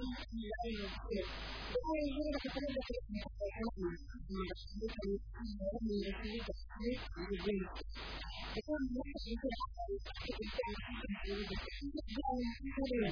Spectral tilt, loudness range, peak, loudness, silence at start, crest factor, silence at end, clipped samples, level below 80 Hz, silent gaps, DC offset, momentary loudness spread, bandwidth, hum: -4.5 dB/octave; 2 LU; -24 dBFS; -42 LUFS; 0 s; 16 dB; 0 s; under 0.1%; -48 dBFS; none; under 0.1%; 6 LU; 5.4 kHz; none